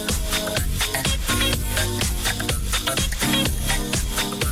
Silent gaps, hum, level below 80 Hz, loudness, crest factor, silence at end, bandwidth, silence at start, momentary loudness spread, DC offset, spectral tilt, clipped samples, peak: none; none; -28 dBFS; -22 LUFS; 12 dB; 0 s; 19.5 kHz; 0 s; 3 LU; under 0.1%; -3 dB/octave; under 0.1%; -12 dBFS